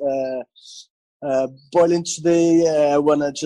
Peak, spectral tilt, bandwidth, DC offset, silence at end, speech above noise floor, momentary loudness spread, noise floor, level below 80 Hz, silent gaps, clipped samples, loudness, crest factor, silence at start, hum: -6 dBFS; -5 dB/octave; 11 kHz; under 0.1%; 0 s; 25 dB; 13 LU; -42 dBFS; -60 dBFS; 0.90-1.20 s; under 0.1%; -18 LUFS; 12 dB; 0 s; none